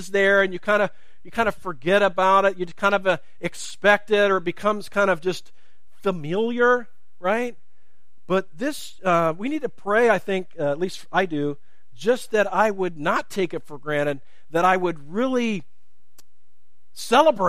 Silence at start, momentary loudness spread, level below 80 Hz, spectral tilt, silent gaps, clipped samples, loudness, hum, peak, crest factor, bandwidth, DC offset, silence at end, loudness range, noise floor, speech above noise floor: 0 s; 11 LU; -60 dBFS; -5 dB/octave; none; under 0.1%; -22 LUFS; none; -2 dBFS; 20 dB; 15.5 kHz; 2%; 0 s; 5 LU; -73 dBFS; 51 dB